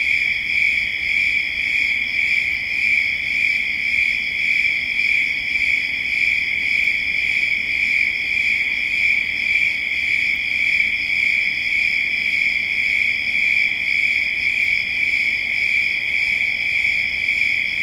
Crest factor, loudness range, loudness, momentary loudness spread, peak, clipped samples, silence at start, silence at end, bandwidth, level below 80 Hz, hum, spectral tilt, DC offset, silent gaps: 14 dB; 1 LU; -17 LUFS; 2 LU; -6 dBFS; under 0.1%; 0 s; 0 s; 16.5 kHz; -48 dBFS; none; -1 dB/octave; under 0.1%; none